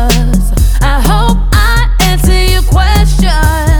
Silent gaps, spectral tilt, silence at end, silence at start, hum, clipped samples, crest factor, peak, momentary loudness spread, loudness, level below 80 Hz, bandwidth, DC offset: none; -5 dB/octave; 0 s; 0 s; none; under 0.1%; 8 dB; 0 dBFS; 2 LU; -10 LUFS; -8 dBFS; 20 kHz; under 0.1%